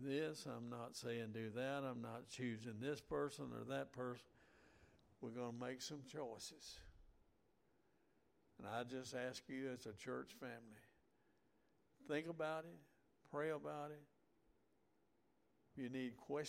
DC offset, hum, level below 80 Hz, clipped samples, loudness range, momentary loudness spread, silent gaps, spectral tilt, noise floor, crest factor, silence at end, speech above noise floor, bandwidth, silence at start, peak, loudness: under 0.1%; none; -78 dBFS; under 0.1%; 6 LU; 13 LU; none; -5 dB/octave; -81 dBFS; 20 dB; 0 s; 33 dB; 16 kHz; 0 s; -32 dBFS; -49 LUFS